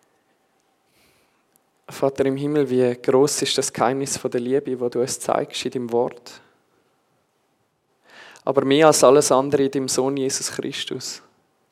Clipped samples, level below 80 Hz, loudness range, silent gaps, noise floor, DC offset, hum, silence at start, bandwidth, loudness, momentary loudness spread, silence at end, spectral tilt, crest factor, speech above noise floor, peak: under 0.1%; -68 dBFS; 8 LU; none; -68 dBFS; under 0.1%; none; 1.9 s; 15.5 kHz; -20 LUFS; 13 LU; 0.55 s; -4 dB/octave; 22 dB; 48 dB; 0 dBFS